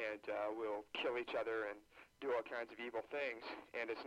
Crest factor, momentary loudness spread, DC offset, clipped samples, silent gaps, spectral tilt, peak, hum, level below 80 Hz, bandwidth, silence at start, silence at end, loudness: 14 dB; 7 LU; under 0.1%; under 0.1%; none; -4 dB/octave; -30 dBFS; none; -80 dBFS; 14 kHz; 0 s; 0 s; -44 LUFS